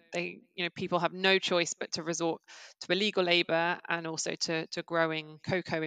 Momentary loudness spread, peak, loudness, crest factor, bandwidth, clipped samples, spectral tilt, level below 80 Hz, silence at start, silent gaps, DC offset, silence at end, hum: 10 LU; -10 dBFS; -30 LUFS; 22 dB; 9.6 kHz; under 0.1%; -3.5 dB/octave; -76 dBFS; 0.1 s; none; under 0.1%; 0 s; none